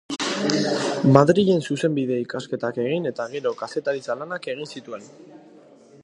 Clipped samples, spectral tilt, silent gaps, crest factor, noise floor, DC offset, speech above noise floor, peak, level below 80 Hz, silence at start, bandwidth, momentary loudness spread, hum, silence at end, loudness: under 0.1%; -6 dB/octave; none; 22 dB; -49 dBFS; under 0.1%; 27 dB; 0 dBFS; -64 dBFS; 0.1 s; 11 kHz; 15 LU; none; 0.65 s; -22 LUFS